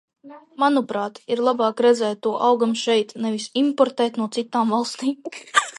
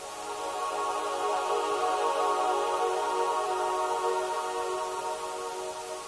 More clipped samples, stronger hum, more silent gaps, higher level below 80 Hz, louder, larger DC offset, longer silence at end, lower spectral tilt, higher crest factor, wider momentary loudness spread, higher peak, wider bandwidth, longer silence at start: neither; neither; neither; second, -78 dBFS vs -68 dBFS; first, -21 LUFS vs -30 LUFS; neither; about the same, 0 s vs 0 s; first, -3.5 dB/octave vs -1.5 dB/octave; first, 20 dB vs 14 dB; about the same, 8 LU vs 8 LU; first, -2 dBFS vs -16 dBFS; about the same, 11.5 kHz vs 11 kHz; first, 0.25 s vs 0 s